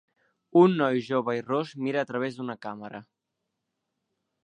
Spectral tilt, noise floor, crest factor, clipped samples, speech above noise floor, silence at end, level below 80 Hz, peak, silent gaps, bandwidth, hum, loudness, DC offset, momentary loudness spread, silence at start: -7.5 dB/octave; -83 dBFS; 22 dB; under 0.1%; 57 dB; 1.45 s; -80 dBFS; -6 dBFS; none; 8.8 kHz; none; -26 LUFS; under 0.1%; 18 LU; 0.55 s